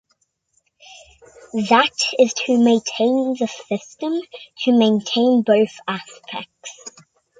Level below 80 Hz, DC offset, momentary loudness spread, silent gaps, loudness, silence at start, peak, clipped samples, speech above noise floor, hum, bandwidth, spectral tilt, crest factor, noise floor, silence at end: -66 dBFS; under 0.1%; 18 LU; none; -18 LUFS; 0.9 s; -2 dBFS; under 0.1%; 49 dB; none; 9.4 kHz; -4 dB/octave; 18 dB; -67 dBFS; 0.5 s